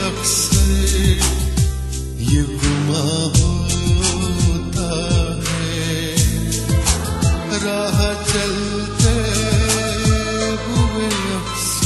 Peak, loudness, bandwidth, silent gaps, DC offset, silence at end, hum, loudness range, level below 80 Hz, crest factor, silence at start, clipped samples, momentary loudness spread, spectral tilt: 0 dBFS; -18 LUFS; 12.5 kHz; none; under 0.1%; 0 s; none; 1 LU; -24 dBFS; 16 dB; 0 s; under 0.1%; 5 LU; -4.5 dB/octave